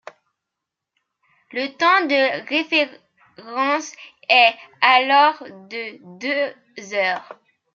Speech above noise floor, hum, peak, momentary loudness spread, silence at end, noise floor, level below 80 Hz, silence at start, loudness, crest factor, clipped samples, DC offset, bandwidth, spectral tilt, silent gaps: 63 dB; none; -2 dBFS; 18 LU; 0.4 s; -83 dBFS; -82 dBFS; 1.55 s; -18 LUFS; 20 dB; under 0.1%; under 0.1%; 7.6 kHz; -2 dB/octave; none